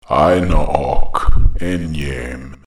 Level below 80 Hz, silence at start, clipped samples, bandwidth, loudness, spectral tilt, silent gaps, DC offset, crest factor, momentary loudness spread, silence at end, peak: -18 dBFS; 0.1 s; under 0.1%; 11 kHz; -18 LUFS; -7 dB/octave; none; under 0.1%; 12 dB; 10 LU; 0.1 s; 0 dBFS